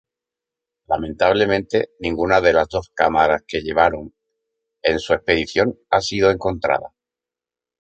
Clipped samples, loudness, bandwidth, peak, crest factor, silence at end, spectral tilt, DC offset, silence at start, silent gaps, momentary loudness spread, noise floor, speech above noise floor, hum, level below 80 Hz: under 0.1%; -19 LUFS; 8.6 kHz; -2 dBFS; 18 dB; 0.95 s; -5 dB/octave; under 0.1%; 0.9 s; none; 8 LU; -89 dBFS; 70 dB; none; -44 dBFS